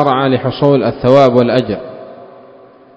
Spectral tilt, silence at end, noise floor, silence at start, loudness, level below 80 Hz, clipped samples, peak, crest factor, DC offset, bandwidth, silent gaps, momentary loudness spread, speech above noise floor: -8 dB/octave; 0.7 s; -41 dBFS; 0 s; -12 LUFS; -46 dBFS; 0.5%; 0 dBFS; 12 dB; under 0.1%; 8 kHz; none; 16 LU; 30 dB